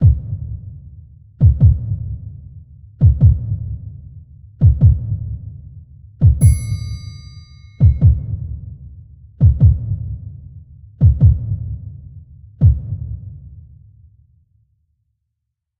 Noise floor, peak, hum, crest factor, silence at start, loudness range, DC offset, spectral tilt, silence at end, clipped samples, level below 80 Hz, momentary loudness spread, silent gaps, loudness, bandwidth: -77 dBFS; 0 dBFS; none; 16 dB; 0 s; 6 LU; under 0.1%; -9 dB/octave; 2.2 s; under 0.1%; -22 dBFS; 23 LU; none; -16 LUFS; 12 kHz